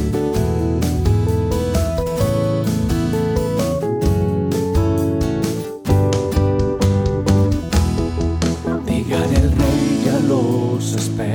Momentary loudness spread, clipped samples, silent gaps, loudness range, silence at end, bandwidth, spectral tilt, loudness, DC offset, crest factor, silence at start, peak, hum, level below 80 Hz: 4 LU; under 0.1%; none; 1 LU; 0 s; over 20 kHz; -7 dB/octave; -18 LUFS; under 0.1%; 14 dB; 0 s; -2 dBFS; none; -26 dBFS